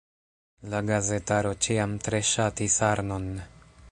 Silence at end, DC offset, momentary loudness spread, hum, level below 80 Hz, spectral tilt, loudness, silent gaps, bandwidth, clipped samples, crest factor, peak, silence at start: 0 s; under 0.1%; 10 LU; none; -48 dBFS; -4 dB/octave; -26 LUFS; none; 11 kHz; under 0.1%; 20 dB; -8 dBFS; 0.6 s